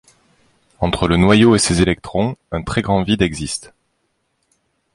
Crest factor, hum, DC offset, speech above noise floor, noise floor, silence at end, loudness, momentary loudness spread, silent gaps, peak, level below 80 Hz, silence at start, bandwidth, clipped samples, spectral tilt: 16 dB; none; under 0.1%; 52 dB; -68 dBFS; 1.35 s; -16 LUFS; 13 LU; none; -2 dBFS; -34 dBFS; 0.8 s; 11.5 kHz; under 0.1%; -5 dB/octave